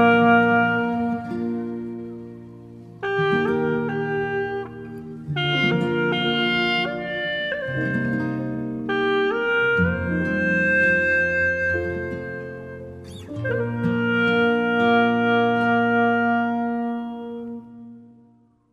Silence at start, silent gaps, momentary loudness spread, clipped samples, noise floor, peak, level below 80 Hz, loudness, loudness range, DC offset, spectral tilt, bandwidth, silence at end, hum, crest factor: 0 s; none; 17 LU; under 0.1%; -56 dBFS; -6 dBFS; -52 dBFS; -21 LUFS; 6 LU; under 0.1%; -7 dB/octave; 7.8 kHz; 0.7 s; none; 16 dB